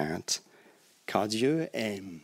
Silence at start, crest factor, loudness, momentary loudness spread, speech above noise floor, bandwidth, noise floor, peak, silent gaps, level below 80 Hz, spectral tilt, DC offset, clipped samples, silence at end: 0 s; 20 dB; -31 LUFS; 7 LU; 30 dB; 16 kHz; -61 dBFS; -12 dBFS; none; -70 dBFS; -4 dB/octave; under 0.1%; under 0.1%; 0.05 s